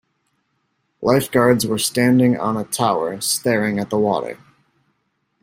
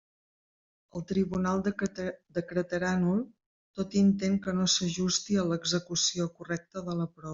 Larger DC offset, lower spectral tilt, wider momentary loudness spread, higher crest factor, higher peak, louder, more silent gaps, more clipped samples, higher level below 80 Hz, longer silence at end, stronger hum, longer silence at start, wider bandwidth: neither; about the same, -4.5 dB/octave vs -4.5 dB/octave; second, 8 LU vs 11 LU; about the same, 18 dB vs 20 dB; first, -2 dBFS vs -10 dBFS; first, -18 LUFS vs -30 LUFS; second, none vs 3.46-3.74 s; neither; about the same, -58 dBFS vs -62 dBFS; first, 1.05 s vs 0 s; neither; about the same, 1 s vs 0.95 s; first, 16 kHz vs 7.8 kHz